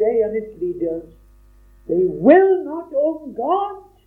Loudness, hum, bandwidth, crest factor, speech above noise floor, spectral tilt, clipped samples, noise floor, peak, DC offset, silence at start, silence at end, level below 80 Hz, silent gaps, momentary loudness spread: -19 LUFS; none; 3.8 kHz; 18 dB; 31 dB; -9.5 dB/octave; under 0.1%; -49 dBFS; 0 dBFS; under 0.1%; 0 s; 0.25 s; -52 dBFS; none; 13 LU